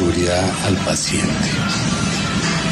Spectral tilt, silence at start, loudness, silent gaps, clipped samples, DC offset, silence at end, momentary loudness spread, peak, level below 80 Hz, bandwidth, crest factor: -4 dB/octave; 0 s; -18 LUFS; none; under 0.1%; under 0.1%; 0 s; 1 LU; -4 dBFS; -36 dBFS; 13.5 kHz; 14 dB